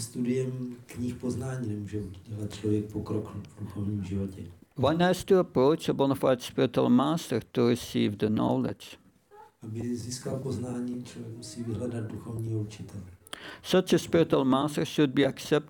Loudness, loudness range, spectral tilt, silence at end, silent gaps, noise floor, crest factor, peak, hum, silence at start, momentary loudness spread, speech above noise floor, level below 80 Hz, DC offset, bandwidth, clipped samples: -29 LUFS; 10 LU; -6 dB/octave; 0 s; none; -55 dBFS; 18 dB; -12 dBFS; none; 0 s; 16 LU; 27 dB; -60 dBFS; under 0.1%; over 20 kHz; under 0.1%